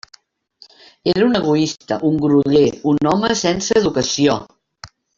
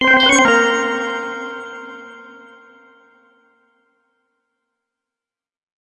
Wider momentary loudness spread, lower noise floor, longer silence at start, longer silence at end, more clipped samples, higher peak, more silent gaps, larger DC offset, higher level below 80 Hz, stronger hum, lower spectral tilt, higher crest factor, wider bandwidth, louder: second, 6 LU vs 25 LU; second, -52 dBFS vs -89 dBFS; first, 1.05 s vs 0 s; second, 0.3 s vs 3.55 s; neither; about the same, -2 dBFS vs 0 dBFS; neither; neither; first, -50 dBFS vs -56 dBFS; neither; first, -5 dB/octave vs -1.5 dB/octave; second, 14 dB vs 20 dB; second, 7.6 kHz vs 10.5 kHz; about the same, -16 LUFS vs -14 LUFS